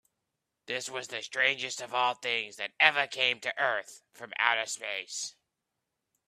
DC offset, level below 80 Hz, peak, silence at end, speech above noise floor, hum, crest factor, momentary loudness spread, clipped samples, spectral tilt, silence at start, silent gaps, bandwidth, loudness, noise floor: under 0.1%; -84 dBFS; -4 dBFS; 1 s; 54 dB; none; 28 dB; 13 LU; under 0.1%; 0 dB/octave; 0.7 s; none; 15 kHz; -29 LUFS; -85 dBFS